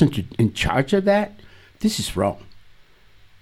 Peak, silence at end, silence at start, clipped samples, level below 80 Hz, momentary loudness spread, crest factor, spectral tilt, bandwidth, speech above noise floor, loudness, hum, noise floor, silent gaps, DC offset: -2 dBFS; 0.85 s; 0 s; under 0.1%; -42 dBFS; 7 LU; 20 dB; -5.5 dB/octave; 16 kHz; 30 dB; -21 LUFS; none; -50 dBFS; none; under 0.1%